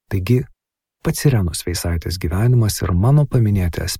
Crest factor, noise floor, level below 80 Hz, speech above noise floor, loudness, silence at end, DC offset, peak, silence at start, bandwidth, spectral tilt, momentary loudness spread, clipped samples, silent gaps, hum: 16 dB; -76 dBFS; -34 dBFS; 60 dB; -18 LUFS; 0 s; under 0.1%; -2 dBFS; 0.1 s; 16 kHz; -6 dB/octave; 8 LU; under 0.1%; none; none